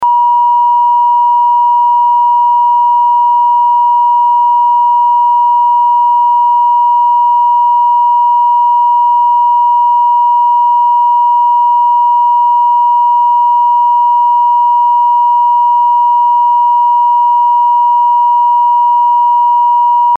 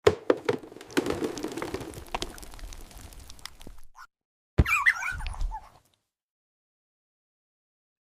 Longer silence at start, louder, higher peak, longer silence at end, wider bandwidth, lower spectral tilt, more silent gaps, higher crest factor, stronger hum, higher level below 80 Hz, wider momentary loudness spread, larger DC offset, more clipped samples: about the same, 0 s vs 0.05 s; first, -8 LUFS vs -29 LUFS; about the same, -4 dBFS vs -6 dBFS; second, 0 s vs 2.35 s; second, 3 kHz vs 16 kHz; second, -3.5 dB/octave vs -5 dB/octave; second, none vs 4.25-4.57 s; second, 4 dB vs 26 dB; first, 60 Hz at -60 dBFS vs none; second, -76 dBFS vs -40 dBFS; second, 0 LU vs 22 LU; neither; neither